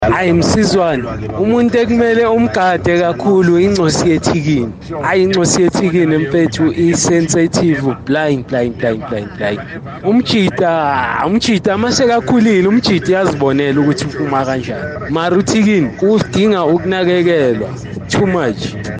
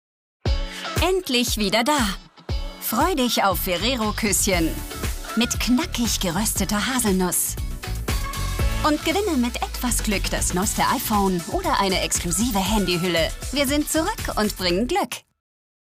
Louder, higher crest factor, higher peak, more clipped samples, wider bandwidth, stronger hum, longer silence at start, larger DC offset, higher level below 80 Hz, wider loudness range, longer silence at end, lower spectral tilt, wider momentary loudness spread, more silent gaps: first, -13 LUFS vs -22 LUFS; about the same, 10 dB vs 14 dB; first, -2 dBFS vs -8 dBFS; neither; second, 10 kHz vs 16 kHz; neither; second, 0 s vs 0.45 s; neither; second, -40 dBFS vs -32 dBFS; about the same, 3 LU vs 2 LU; second, 0 s vs 0.7 s; first, -5.5 dB/octave vs -3.5 dB/octave; about the same, 8 LU vs 8 LU; neither